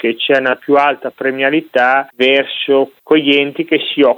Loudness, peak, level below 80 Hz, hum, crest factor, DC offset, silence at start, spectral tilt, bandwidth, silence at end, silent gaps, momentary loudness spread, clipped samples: -13 LUFS; -2 dBFS; -64 dBFS; none; 12 dB; under 0.1%; 0.05 s; -5.5 dB/octave; 14.5 kHz; 0 s; none; 4 LU; under 0.1%